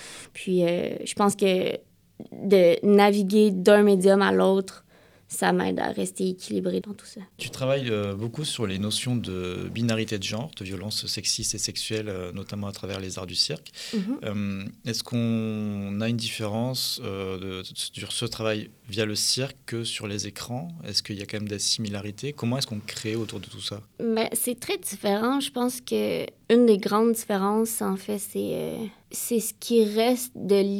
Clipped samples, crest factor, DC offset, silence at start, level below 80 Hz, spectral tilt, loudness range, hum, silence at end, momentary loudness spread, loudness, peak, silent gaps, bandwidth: under 0.1%; 22 dB; under 0.1%; 0 s; -62 dBFS; -4.5 dB/octave; 9 LU; none; 0 s; 14 LU; -26 LUFS; -4 dBFS; none; 18 kHz